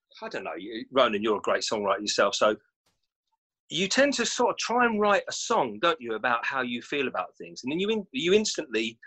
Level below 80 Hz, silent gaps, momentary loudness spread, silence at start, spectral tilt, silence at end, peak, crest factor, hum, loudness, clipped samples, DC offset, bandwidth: -68 dBFS; 2.76-2.85 s, 3.16-3.23 s, 3.38-3.50 s, 3.60-3.68 s; 12 LU; 0.15 s; -3 dB/octave; 0 s; -8 dBFS; 20 dB; none; -26 LUFS; under 0.1%; under 0.1%; 9.2 kHz